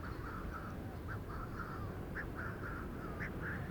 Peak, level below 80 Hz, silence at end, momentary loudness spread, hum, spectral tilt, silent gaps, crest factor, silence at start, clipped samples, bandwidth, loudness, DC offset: -30 dBFS; -50 dBFS; 0 s; 3 LU; none; -7.5 dB/octave; none; 14 dB; 0 s; under 0.1%; over 20 kHz; -44 LUFS; under 0.1%